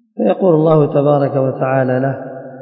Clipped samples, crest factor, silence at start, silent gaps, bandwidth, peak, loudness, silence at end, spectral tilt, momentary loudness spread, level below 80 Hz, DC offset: under 0.1%; 14 dB; 0.15 s; none; 4.7 kHz; 0 dBFS; -14 LUFS; 0 s; -13 dB/octave; 9 LU; -62 dBFS; under 0.1%